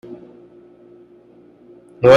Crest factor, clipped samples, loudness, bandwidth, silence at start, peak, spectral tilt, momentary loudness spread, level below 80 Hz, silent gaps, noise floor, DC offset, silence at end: 18 dB; under 0.1%; -20 LUFS; 6.8 kHz; 2 s; 0 dBFS; -6.5 dB/octave; 13 LU; -54 dBFS; none; -48 dBFS; under 0.1%; 0 s